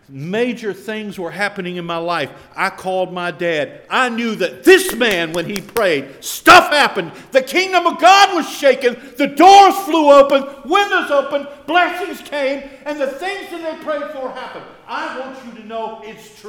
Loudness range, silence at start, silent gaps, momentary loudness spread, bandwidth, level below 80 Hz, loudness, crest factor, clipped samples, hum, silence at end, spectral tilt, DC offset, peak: 13 LU; 0.1 s; none; 18 LU; over 20 kHz; -52 dBFS; -14 LUFS; 16 dB; 0.2%; none; 0 s; -3 dB/octave; under 0.1%; 0 dBFS